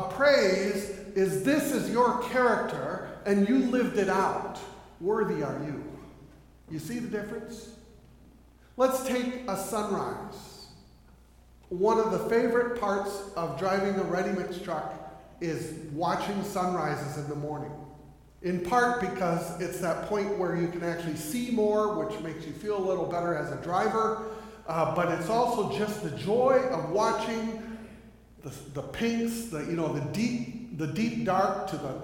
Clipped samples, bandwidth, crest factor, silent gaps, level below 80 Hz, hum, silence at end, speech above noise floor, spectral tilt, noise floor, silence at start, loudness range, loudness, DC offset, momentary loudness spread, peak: under 0.1%; 17 kHz; 20 dB; none; -56 dBFS; none; 0 s; 27 dB; -5.5 dB/octave; -56 dBFS; 0 s; 6 LU; -29 LUFS; under 0.1%; 15 LU; -10 dBFS